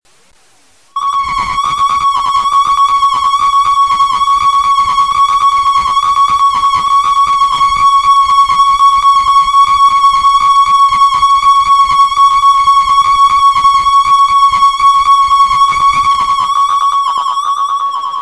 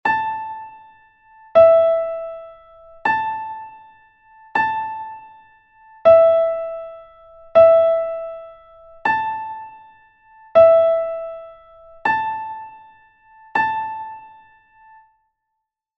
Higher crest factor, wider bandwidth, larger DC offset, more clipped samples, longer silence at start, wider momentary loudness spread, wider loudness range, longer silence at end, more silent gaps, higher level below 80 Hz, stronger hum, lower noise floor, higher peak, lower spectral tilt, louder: second, 8 dB vs 18 dB; first, 11 kHz vs 5.8 kHz; first, 0.4% vs under 0.1%; neither; first, 0.95 s vs 0.05 s; second, 6 LU vs 23 LU; second, 3 LU vs 9 LU; second, 0 s vs 1.7 s; neither; first, -38 dBFS vs -58 dBFS; neither; second, -49 dBFS vs -79 dBFS; about the same, 0 dBFS vs -2 dBFS; second, -0.5 dB/octave vs -6 dB/octave; first, -8 LUFS vs -17 LUFS